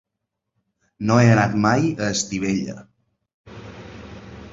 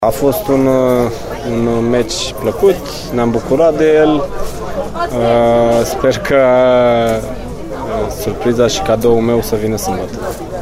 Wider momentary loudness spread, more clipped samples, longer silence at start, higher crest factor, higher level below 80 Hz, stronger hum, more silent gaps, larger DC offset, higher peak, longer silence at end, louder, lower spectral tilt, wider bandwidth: first, 24 LU vs 12 LU; neither; first, 1 s vs 0 s; first, 20 dB vs 12 dB; second, -50 dBFS vs -32 dBFS; neither; first, 3.34-3.44 s vs none; neither; about the same, -2 dBFS vs 0 dBFS; about the same, 0.05 s vs 0 s; second, -19 LUFS vs -13 LUFS; about the same, -5.5 dB/octave vs -5.5 dB/octave; second, 8 kHz vs 16 kHz